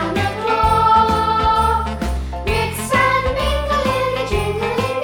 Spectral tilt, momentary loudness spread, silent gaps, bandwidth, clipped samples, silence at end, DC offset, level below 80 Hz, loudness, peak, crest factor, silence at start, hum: -5 dB/octave; 7 LU; none; 19 kHz; under 0.1%; 0 s; under 0.1%; -28 dBFS; -17 LUFS; -2 dBFS; 16 dB; 0 s; none